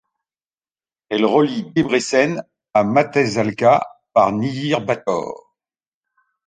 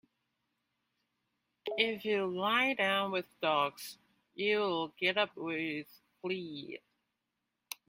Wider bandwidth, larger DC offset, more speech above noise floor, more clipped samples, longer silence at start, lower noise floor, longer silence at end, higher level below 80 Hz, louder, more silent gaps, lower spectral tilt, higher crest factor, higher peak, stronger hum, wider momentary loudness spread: second, 9.6 kHz vs 16.5 kHz; neither; first, over 73 dB vs 52 dB; neither; second, 1.1 s vs 1.65 s; first, under -90 dBFS vs -86 dBFS; first, 1.1 s vs 0.15 s; first, -58 dBFS vs -80 dBFS; first, -18 LUFS vs -33 LUFS; neither; first, -5.5 dB/octave vs -4 dB/octave; about the same, 18 dB vs 22 dB; first, -2 dBFS vs -14 dBFS; neither; second, 8 LU vs 17 LU